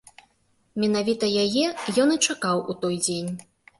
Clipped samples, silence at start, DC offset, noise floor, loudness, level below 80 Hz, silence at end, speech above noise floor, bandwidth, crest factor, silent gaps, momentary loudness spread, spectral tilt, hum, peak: under 0.1%; 0.75 s; under 0.1%; -66 dBFS; -24 LUFS; -64 dBFS; 0.35 s; 43 dB; 12 kHz; 18 dB; none; 10 LU; -3.5 dB/octave; none; -8 dBFS